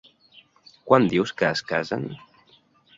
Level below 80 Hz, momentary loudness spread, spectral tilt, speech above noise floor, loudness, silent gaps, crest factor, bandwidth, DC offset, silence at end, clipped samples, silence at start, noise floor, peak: -60 dBFS; 15 LU; -6 dB/octave; 37 dB; -23 LUFS; none; 22 dB; 7.8 kHz; under 0.1%; 0.8 s; under 0.1%; 0.85 s; -59 dBFS; -2 dBFS